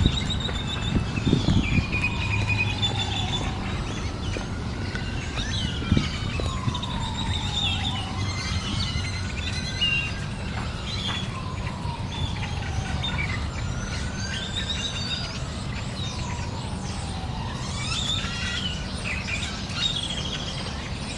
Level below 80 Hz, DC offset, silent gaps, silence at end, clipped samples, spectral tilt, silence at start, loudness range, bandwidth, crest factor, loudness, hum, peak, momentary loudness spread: -36 dBFS; under 0.1%; none; 0 s; under 0.1%; -4.5 dB/octave; 0 s; 5 LU; 11.5 kHz; 24 dB; -27 LUFS; none; -4 dBFS; 8 LU